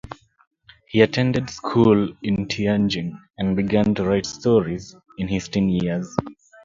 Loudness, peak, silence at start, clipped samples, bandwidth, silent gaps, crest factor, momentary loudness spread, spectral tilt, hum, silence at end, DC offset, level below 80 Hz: -21 LUFS; 0 dBFS; 0.05 s; under 0.1%; 7.6 kHz; 0.47-0.51 s; 22 dB; 14 LU; -6.5 dB/octave; none; 0.3 s; under 0.1%; -46 dBFS